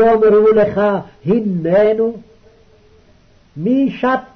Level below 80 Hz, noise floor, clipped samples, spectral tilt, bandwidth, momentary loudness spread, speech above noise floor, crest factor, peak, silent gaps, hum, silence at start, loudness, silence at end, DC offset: -48 dBFS; -49 dBFS; under 0.1%; -9 dB/octave; 6 kHz; 11 LU; 36 dB; 10 dB; -4 dBFS; none; none; 0 s; -14 LUFS; 0.15 s; under 0.1%